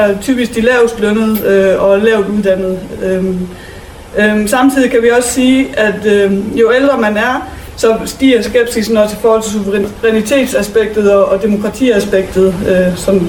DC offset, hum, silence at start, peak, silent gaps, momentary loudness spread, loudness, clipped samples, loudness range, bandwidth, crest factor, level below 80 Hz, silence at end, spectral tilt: under 0.1%; none; 0 s; 0 dBFS; none; 6 LU; -11 LUFS; under 0.1%; 2 LU; 19 kHz; 10 dB; -36 dBFS; 0 s; -5 dB/octave